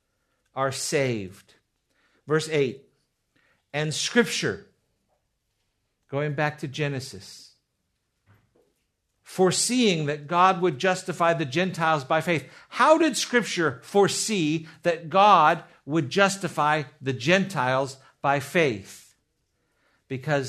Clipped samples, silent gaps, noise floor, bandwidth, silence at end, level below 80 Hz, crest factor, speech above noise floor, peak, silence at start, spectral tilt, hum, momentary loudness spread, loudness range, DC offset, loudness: under 0.1%; none; -76 dBFS; 13.5 kHz; 0 s; -70 dBFS; 22 dB; 53 dB; -4 dBFS; 0.55 s; -4 dB/octave; none; 14 LU; 11 LU; under 0.1%; -24 LUFS